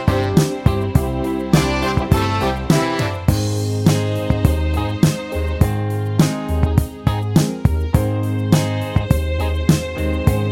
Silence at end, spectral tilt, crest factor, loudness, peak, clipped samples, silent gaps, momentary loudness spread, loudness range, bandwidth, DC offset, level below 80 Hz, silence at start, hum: 0 s; -6.5 dB/octave; 16 dB; -18 LUFS; 0 dBFS; under 0.1%; none; 4 LU; 1 LU; 17 kHz; under 0.1%; -26 dBFS; 0 s; none